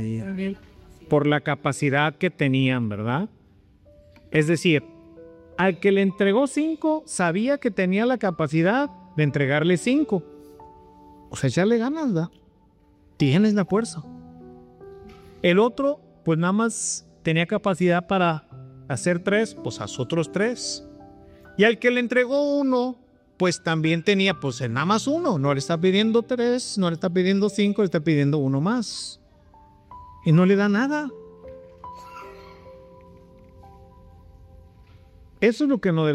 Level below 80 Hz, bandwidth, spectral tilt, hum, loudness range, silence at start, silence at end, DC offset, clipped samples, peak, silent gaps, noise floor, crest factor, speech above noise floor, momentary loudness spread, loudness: -58 dBFS; 12 kHz; -5.5 dB/octave; none; 4 LU; 0 s; 0 s; under 0.1%; under 0.1%; -6 dBFS; none; -57 dBFS; 18 dB; 36 dB; 13 LU; -22 LUFS